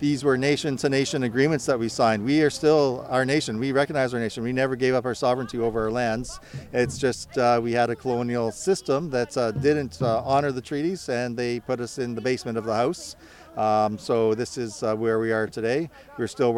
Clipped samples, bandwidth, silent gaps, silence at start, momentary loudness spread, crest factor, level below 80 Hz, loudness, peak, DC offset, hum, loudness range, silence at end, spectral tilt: under 0.1%; 14.5 kHz; none; 0 s; 7 LU; 16 dB; -54 dBFS; -24 LUFS; -8 dBFS; under 0.1%; none; 4 LU; 0 s; -5.5 dB/octave